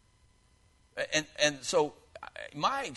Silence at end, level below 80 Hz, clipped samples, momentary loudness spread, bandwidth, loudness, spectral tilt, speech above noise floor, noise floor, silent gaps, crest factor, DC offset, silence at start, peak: 0 s; -66 dBFS; under 0.1%; 18 LU; 11.5 kHz; -30 LUFS; -2 dB/octave; 35 dB; -65 dBFS; none; 22 dB; under 0.1%; 0.95 s; -12 dBFS